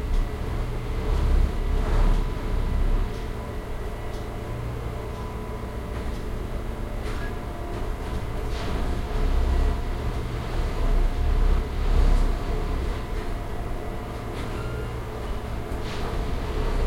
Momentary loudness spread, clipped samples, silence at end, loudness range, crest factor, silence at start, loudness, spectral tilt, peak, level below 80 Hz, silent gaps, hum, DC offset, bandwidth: 8 LU; under 0.1%; 0 s; 6 LU; 16 dB; 0 s; -30 LUFS; -6.5 dB/octave; -10 dBFS; -26 dBFS; none; none; under 0.1%; 12.5 kHz